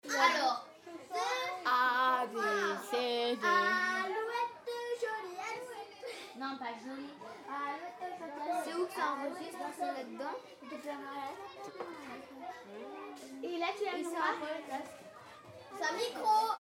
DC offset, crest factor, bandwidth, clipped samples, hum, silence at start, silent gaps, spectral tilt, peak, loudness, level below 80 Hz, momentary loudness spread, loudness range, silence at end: under 0.1%; 22 dB; 17 kHz; under 0.1%; none; 0.05 s; none; -2 dB/octave; -14 dBFS; -36 LUFS; -86 dBFS; 18 LU; 11 LU; 0 s